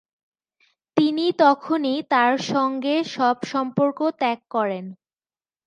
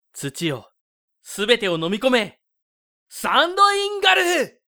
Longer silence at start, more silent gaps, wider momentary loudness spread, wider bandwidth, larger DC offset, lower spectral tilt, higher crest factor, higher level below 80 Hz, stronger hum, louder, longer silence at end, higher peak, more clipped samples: first, 0.95 s vs 0.15 s; second, none vs 0.81-1.08 s, 2.62-3.06 s; second, 7 LU vs 15 LU; second, 9.6 kHz vs over 20 kHz; neither; first, -5.5 dB/octave vs -3 dB/octave; about the same, 20 dB vs 22 dB; second, -76 dBFS vs -62 dBFS; neither; about the same, -21 LUFS vs -19 LUFS; first, 0.75 s vs 0.2 s; second, -4 dBFS vs 0 dBFS; neither